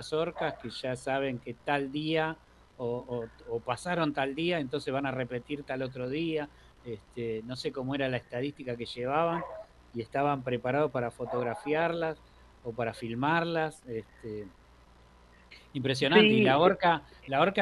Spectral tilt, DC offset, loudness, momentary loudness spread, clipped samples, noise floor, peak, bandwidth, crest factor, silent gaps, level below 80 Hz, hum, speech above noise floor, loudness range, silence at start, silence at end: -6 dB/octave; under 0.1%; -30 LUFS; 17 LU; under 0.1%; -58 dBFS; -8 dBFS; 12 kHz; 22 dB; none; -60 dBFS; none; 27 dB; 8 LU; 0 s; 0 s